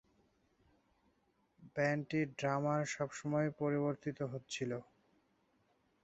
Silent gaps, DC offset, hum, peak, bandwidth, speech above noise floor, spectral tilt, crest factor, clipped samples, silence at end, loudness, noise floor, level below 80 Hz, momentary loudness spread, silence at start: none; under 0.1%; none; -22 dBFS; 8 kHz; 39 dB; -6 dB/octave; 18 dB; under 0.1%; 1.2 s; -38 LUFS; -77 dBFS; -76 dBFS; 7 LU; 1.6 s